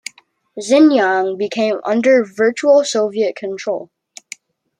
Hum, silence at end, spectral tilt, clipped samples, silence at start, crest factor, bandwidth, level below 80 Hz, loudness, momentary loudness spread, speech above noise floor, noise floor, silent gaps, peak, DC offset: none; 0.95 s; -4 dB/octave; under 0.1%; 0.55 s; 14 dB; 11 kHz; -70 dBFS; -15 LUFS; 23 LU; 35 dB; -49 dBFS; none; -2 dBFS; under 0.1%